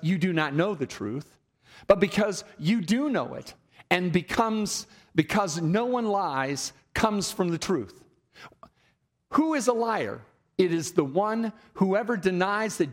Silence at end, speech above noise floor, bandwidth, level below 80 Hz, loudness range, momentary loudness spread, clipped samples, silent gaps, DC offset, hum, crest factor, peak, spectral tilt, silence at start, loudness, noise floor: 0 s; 43 dB; 16 kHz; -58 dBFS; 3 LU; 9 LU; under 0.1%; none; under 0.1%; none; 20 dB; -6 dBFS; -5 dB/octave; 0 s; -27 LUFS; -69 dBFS